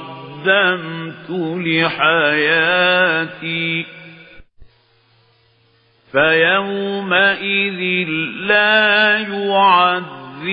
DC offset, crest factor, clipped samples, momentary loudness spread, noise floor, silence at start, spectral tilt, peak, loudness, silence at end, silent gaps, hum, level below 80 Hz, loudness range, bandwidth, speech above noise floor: under 0.1%; 16 dB; under 0.1%; 11 LU; -56 dBFS; 0 s; -9.5 dB/octave; 0 dBFS; -15 LUFS; 0 s; none; none; -58 dBFS; 6 LU; 5.2 kHz; 40 dB